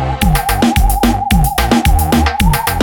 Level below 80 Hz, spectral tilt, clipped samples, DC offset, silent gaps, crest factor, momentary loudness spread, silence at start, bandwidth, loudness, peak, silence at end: -16 dBFS; -5 dB/octave; under 0.1%; under 0.1%; none; 12 dB; 2 LU; 0 s; 20 kHz; -13 LUFS; 0 dBFS; 0 s